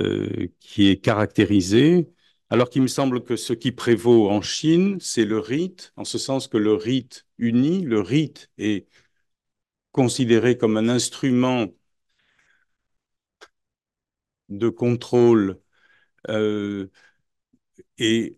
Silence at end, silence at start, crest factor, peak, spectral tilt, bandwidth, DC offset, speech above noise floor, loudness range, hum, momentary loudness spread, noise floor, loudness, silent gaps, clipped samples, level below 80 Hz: 0.05 s; 0 s; 18 dB; -4 dBFS; -5.5 dB/octave; 12.5 kHz; under 0.1%; 69 dB; 5 LU; none; 13 LU; -89 dBFS; -21 LUFS; none; under 0.1%; -64 dBFS